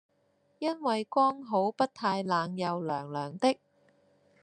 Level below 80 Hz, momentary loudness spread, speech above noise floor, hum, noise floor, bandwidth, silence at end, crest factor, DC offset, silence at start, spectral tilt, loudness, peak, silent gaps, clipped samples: -80 dBFS; 7 LU; 41 dB; none; -71 dBFS; 9.8 kHz; 0.85 s; 20 dB; under 0.1%; 0.6 s; -6 dB/octave; -30 LUFS; -12 dBFS; none; under 0.1%